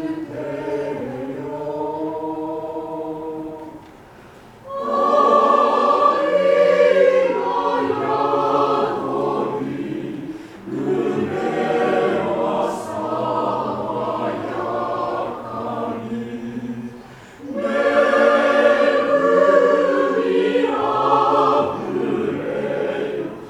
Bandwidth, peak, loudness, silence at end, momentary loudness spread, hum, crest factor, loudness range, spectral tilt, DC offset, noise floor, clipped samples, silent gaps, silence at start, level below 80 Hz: 11.5 kHz; -2 dBFS; -19 LUFS; 0 s; 14 LU; none; 18 dB; 11 LU; -6 dB/octave; under 0.1%; -43 dBFS; under 0.1%; none; 0 s; -58 dBFS